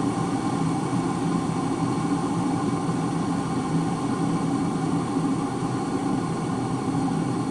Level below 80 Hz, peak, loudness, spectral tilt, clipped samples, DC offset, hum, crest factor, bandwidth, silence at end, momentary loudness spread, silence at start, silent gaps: -52 dBFS; -10 dBFS; -26 LUFS; -6.5 dB/octave; under 0.1%; under 0.1%; none; 14 dB; 11.5 kHz; 0 s; 2 LU; 0 s; none